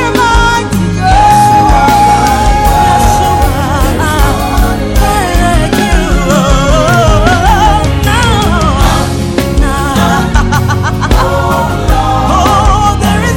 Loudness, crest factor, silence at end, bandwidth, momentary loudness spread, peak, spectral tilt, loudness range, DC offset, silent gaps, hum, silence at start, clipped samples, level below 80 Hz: -9 LUFS; 8 dB; 0 s; 17.5 kHz; 5 LU; 0 dBFS; -5 dB/octave; 3 LU; under 0.1%; none; none; 0 s; 0.1%; -14 dBFS